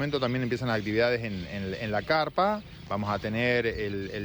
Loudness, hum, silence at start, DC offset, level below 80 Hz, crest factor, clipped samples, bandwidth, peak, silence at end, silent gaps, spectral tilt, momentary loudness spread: -28 LUFS; none; 0 s; under 0.1%; -52 dBFS; 16 dB; under 0.1%; over 20 kHz; -14 dBFS; 0 s; none; -6.5 dB/octave; 8 LU